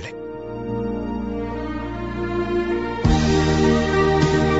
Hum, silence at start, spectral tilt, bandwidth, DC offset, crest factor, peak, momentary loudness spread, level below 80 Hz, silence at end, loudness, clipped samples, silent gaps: none; 0 s; -6.5 dB/octave; 8 kHz; 0.3%; 14 dB; -6 dBFS; 11 LU; -32 dBFS; 0 s; -21 LUFS; under 0.1%; none